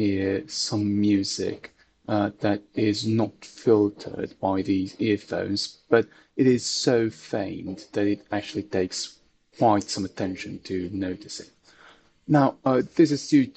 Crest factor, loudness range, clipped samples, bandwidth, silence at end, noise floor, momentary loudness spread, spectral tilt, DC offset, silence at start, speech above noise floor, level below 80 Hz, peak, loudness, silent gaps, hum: 18 dB; 3 LU; under 0.1%; 8.8 kHz; 0.05 s; -55 dBFS; 11 LU; -5.5 dB/octave; under 0.1%; 0 s; 30 dB; -62 dBFS; -6 dBFS; -25 LUFS; none; none